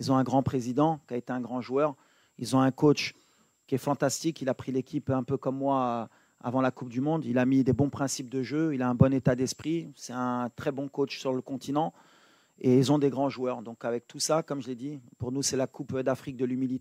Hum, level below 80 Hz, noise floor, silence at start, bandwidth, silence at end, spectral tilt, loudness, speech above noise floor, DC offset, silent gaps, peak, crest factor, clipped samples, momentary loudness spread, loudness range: none; -62 dBFS; -63 dBFS; 0 s; 15.5 kHz; 0 s; -6 dB/octave; -29 LUFS; 35 dB; under 0.1%; none; -6 dBFS; 22 dB; under 0.1%; 10 LU; 4 LU